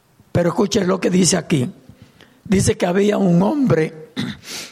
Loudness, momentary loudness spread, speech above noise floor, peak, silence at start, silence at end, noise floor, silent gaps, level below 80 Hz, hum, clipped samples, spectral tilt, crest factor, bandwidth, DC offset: -18 LUFS; 12 LU; 31 dB; -4 dBFS; 0.35 s; 0 s; -48 dBFS; none; -46 dBFS; none; under 0.1%; -5.5 dB/octave; 16 dB; 14.5 kHz; under 0.1%